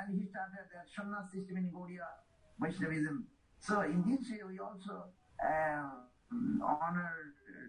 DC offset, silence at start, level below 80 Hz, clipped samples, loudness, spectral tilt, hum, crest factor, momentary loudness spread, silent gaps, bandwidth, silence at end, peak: under 0.1%; 0 s; -70 dBFS; under 0.1%; -39 LUFS; -7.5 dB/octave; none; 18 dB; 15 LU; none; 10 kHz; 0 s; -20 dBFS